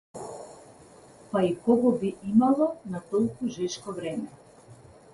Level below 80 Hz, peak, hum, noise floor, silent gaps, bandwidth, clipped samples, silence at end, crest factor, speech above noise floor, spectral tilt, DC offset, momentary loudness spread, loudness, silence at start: -64 dBFS; -10 dBFS; none; -52 dBFS; none; 11.5 kHz; under 0.1%; 0.4 s; 18 dB; 26 dB; -6.5 dB/octave; under 0.1%; 18 LU; -27 LUFS; 0.15 s